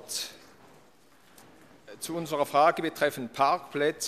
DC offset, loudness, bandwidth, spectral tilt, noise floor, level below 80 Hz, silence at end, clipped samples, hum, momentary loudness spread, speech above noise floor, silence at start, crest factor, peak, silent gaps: under 0.1%; -28 LUFS; 15 kHz; -3.5 dB/octave; -60 dBFS; -72 dBFS; 0 s; under 0.1%; none; 13 LU; 33 dB; 0 s; 20 dB; -10 dBFS; none